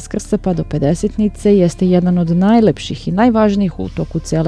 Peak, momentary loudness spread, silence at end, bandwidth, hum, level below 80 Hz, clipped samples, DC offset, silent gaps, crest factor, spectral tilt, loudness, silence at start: 0 dBFS; 8 LU; 0 s; 11 kHz; none; -34 dBFS; under 0.1%; under 0.1%; none; 14 dB; -7.5 dB/octave; -15 LUFS; 0 s